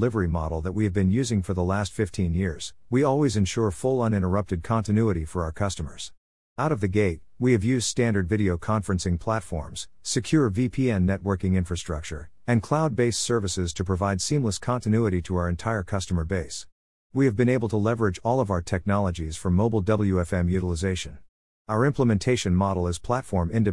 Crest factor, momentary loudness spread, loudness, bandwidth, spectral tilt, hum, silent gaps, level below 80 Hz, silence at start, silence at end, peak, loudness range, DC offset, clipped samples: 16 dB; 7 LU; -25 LUFS; 12 kHz; -6 dB/octave; none; 6.18-6.56 s, 16.72-17.10 s, 21.29-21.65 s; -44 dBFS; 0 s; 0 s; -8 dBFS; 2 LU; 0.4%; under 0.1%